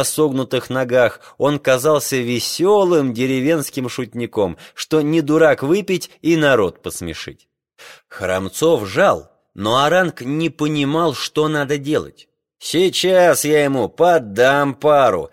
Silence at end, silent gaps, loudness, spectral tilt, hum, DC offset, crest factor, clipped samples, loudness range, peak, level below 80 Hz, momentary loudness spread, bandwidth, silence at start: 0.05 s; none; -17 LUFS; -4.5 dB/octave; none; under 0.1%; 14 dB; under 0.1%; 3 LU; -2 dBFS; -54 dBFS; 11 LU; 16.5 kHz; 0 s